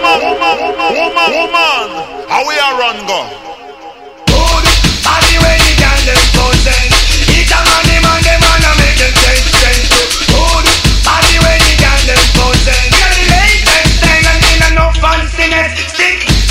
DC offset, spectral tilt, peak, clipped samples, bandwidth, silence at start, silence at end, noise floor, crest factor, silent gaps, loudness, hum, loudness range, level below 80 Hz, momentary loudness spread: 0.2%; -3 dB/octave; 0 dBFS; 1%; 16.5 kHz; 0 s; 0 s; -30 dBFS; 8 dB; none; -8 LUFS; none; 5 LU; -12 dBFS; 6 LU